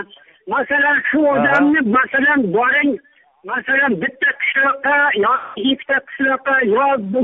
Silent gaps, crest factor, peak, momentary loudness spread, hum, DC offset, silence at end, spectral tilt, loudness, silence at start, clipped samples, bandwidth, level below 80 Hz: none; 12 dB; -4 dBFS; 6 LU; none; under 0.1%; 0 s; -2 dB/octave; -15 LUFS; 0 s; under 0.1%; 4 kHz; -58 dBFS